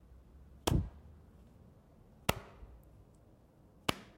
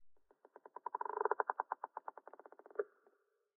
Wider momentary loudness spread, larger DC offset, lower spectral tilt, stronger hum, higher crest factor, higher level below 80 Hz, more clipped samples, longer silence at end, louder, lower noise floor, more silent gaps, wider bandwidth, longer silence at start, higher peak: first, 26 LU vs 20 LU; neither; first, -4.5 dB/octave vs 6.5 dB/octave; neither; first, 32 dB vs 26 dB; first, -50 dBFS vs under -90 dBFS; neither; second, 0.15 s vs 0.7 s; first, -38 LUFS vs -43 LUFS; second, -63 dBFS vs -76 dBFS; neither; first, 16 kHz vs 2.3 kHz; about the same, 0.1 s vs 0 s; first, -10 dBFS vs -18 dBFS